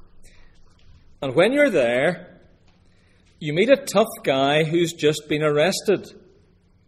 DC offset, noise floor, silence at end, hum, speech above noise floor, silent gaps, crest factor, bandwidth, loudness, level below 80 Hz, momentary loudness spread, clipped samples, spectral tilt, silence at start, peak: under 0.1%; -57 dBFS; 0.8 s; none; 37 dB; none; 20 dB; 15 kHz; -20 LUFS; -56 dBFS; 8 LU; under 0.1%; -5 dB/octave; 1.2 s; -2 dBFS